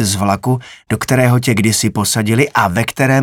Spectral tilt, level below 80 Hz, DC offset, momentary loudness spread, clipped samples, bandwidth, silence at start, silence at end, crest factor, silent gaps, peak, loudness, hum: -4.5 dB/octave; -46 dBFS; under 0.1%; 7 LU; under 0.1%; 18 kHz; 0 s; 0 s; 12 dB; none; 0 dBFS; -14 LUFS; none